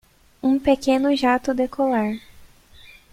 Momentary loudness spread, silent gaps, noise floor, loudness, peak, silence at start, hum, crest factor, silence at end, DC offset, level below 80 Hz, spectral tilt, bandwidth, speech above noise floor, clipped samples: 7 LU; none; -48 dBFS; -21 LUFS; -6 dBFS; 0.45 s; none; 16 dB; 0.65 s; under 0.1%; -50 dBFS; -5 dB/octave; 14.5 kHz; 28 dB; under 0.1%